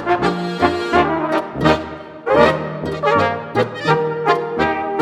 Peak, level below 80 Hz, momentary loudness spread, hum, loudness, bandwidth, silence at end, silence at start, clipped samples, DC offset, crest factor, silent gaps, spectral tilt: 0 dBFS; -42 dBFS; 6 LU; none; -17 LUFS; 13.5 kHz; 0 s; 0 s; under 0.1%; under 0.1%; 18 dB; none; -6.5 dB/octave